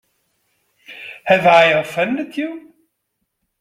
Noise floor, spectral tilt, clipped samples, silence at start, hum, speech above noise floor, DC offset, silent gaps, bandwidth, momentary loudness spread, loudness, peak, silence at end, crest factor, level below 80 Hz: -73 dBFS; -5 dB/octave; under 0.1%; 0.9 s; none; 58 dB; under 0.1%; none; 15 kHz; 23 LU; -15 LUFS; 0 dBFS; 1 s; 18 dB; -62 dBFS